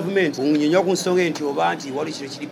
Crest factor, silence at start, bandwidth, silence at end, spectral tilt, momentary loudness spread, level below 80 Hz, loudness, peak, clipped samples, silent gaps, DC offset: 16 dB; 0 s; 14.5 kHz; 0 s; -5 dB/octave; 9 LU; -74 dBFS; -21 LUFS; -4 dBFS; under 0.1%; none; under 0.1%